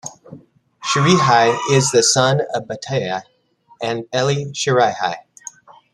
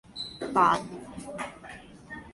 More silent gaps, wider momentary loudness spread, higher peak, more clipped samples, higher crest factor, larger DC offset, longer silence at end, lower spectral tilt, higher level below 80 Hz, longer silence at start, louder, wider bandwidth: neither; second, 16 LU vs 22 LU; first, 0 dBFS vs -8 dBFS; neither; about the same, 18 dB vs 22 dB; neither; first, 0.75 s vs 0 s; about the same, -4 dB/octave vs -4.5 dB/octave; about the same, -60 dBFS vs -58 dBFS; about the same, 0.05 s vs 0.1 s; first, -17 LUFS vs -28 LUFS; about the same, 12.5 kHz vs 11.5 kHz